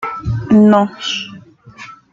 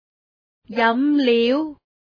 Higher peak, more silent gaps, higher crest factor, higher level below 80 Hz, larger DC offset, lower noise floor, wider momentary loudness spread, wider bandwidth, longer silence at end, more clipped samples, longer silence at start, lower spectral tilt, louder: about the same, -2 dBFS vs -4 dBFS; neither; about the same, 14 dB vs 16 dB; first, -40 dBFS vs -66 dBFS; neither; second, -38 dBFS vs under -90 dBFS; first, 24 LU vs 11 LU; first, 7.4 kHz vs 5.2 kHz; second, 0.2 s vs 0.45 s; neither; second, 0 s vs 0.7 s; about the same, -6.5 dB/octave vs -6 dB/octave; first, -13 LUFS vs -19 LUFS